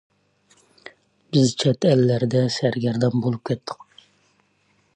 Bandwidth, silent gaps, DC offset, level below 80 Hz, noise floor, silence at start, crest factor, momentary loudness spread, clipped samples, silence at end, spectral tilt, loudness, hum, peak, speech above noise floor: 9.8 kHz; none; under 0.1%; -62 dBFS; -64 dBFS; 0.85 s; 18 dB; 10 LU; under 0.1%; 1.2 s; -6.5 dB/octave; -21 LUFS; none; -6 dBFS; 44 dB